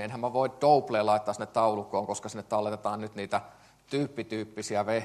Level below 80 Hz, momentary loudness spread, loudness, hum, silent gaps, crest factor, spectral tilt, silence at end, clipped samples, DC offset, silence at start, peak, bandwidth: -70 dBFS; 11 LU; -29 LUFS; none; none; 20 dB; -5 dB/octave; 0 s; under 0.1%; under 0.1%; 0 s; -10 dBFS; 13 kHz